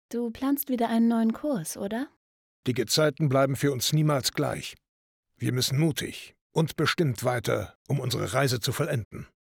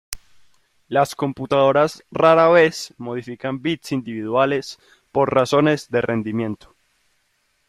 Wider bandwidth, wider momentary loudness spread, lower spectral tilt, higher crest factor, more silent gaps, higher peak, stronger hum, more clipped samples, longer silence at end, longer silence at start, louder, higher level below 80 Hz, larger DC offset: first, 18 kHz vs 16 kHz; second, 10 LU vs 15 LU; about the same, -5 dB/octave vs -5.5 dB/octave; about the same, 16 dB vs 18 dB; first, 2.16-2.63 s, 4.89-5.23 s, 6.41-6.50 s, 7.75-7.85 s, 9.05-9.11 s vs none; second, -10 dBFS vs -2 dBFS; neither; neither; second, 0.25 s vs 1.15 s; about the same, 0.1 s vs 0.1 s; second, -27 LUFS vs -19 LUFS; second, -62 dBFS vs -56 dBFS; neither